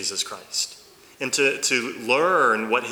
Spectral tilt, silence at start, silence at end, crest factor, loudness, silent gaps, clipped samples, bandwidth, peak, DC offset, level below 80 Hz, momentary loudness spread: -1.5 dB/octave; 0 s; 0 s; 18 dB; -22 LUFS; none; under 0.1%; over 20 kHz; -6 dBFS; under 0.1%; -72 dBFS; 9 LU